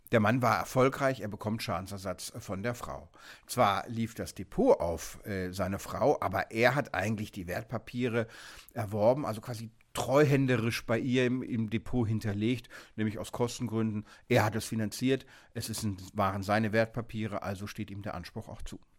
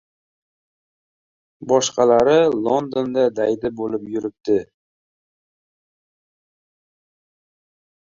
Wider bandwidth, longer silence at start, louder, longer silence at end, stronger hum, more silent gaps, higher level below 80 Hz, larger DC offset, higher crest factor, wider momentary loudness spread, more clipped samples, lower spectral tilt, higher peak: first, 17 kHz vs 7.6 kHz; second, 0.1 s vs 1.6 s; second, -31 LUFS vs -19 LUFS; second, 0.2 s vs 3.4 s; neither; neither; first, -54 dBFS vs -60 dBFS; neither; about the same, 20 dB vs 20 dB; first, 14 LU vs 11 LU; neither; first, -6 dB/octave vs -4.5 dB/octave; second, -10 dBFS vs -2 dBFS